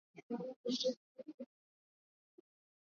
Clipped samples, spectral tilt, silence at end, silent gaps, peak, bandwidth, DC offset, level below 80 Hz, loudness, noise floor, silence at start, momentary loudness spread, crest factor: under 0.1%; -4 dB/octave; 1.45 s; 0.23-0.30 s, 0.56-0.64 s, 0.97-1.15 s, 1.34-1.38 s; -26 dBFS; 7.2 kHz; under 0.1%; under -90 dBFS; -41 LUFS; under -90 dBFS; 0.15 s; 18 LU; 20 dB